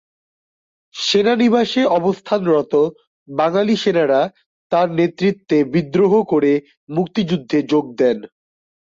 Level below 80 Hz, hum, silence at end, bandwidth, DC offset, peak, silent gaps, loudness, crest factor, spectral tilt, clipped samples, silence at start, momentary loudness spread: -60 dBFS; none; 0.55 s; 7.6 kHz; under 0.1%; -4 dBFS; 3.07-3.26 s, 4.46-4.70 s, 6.77-6.87 s; -17 LUFS; 14 dB; -6 dB/octave; under 0.1%; 0.95 s; 7 LU